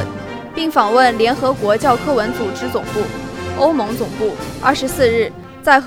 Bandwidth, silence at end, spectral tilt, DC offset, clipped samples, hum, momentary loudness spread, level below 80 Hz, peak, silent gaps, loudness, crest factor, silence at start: 17 kHz; 0 s; -4.5 dB/octave; under 0.1%; under 0.1%; none; 11 LU; -42 dBFS; 0 dBFS; none; -17 LUFS; 16 dB; 0 s